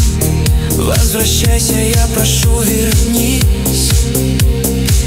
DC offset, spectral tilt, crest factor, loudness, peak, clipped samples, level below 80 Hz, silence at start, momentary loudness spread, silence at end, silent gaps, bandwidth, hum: under 0.1%; -4.5 dB/octave; 12 dB; -12 LUFS; 0 dBFS; under 0.1%; -16 dBFS; 0 s; 2 LU; 0 s; none; 16.5 kHz; none